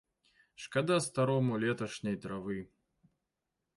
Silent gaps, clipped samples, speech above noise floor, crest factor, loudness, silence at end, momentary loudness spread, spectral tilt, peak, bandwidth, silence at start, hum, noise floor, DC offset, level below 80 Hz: none; under 0.1%; 54 dB; 18 dB; -34 LUFS; 1.1 s; 12 LU; -5.5 dB/octave; -18 dBFS; 11.5 kHz; 0.6 s; none; -87 dBFS; under 0.1%; -70 dBFS